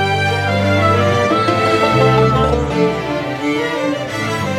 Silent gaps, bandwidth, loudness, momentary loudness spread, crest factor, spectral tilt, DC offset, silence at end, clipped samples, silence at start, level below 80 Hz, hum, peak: none; 15 kHz; -15 LUFS; 7 LU; 14 dB; -6 dB/octave; under 0.1%; 0 s; under 0.1%; 0 s; -34 dBFS; none; 0 dBFS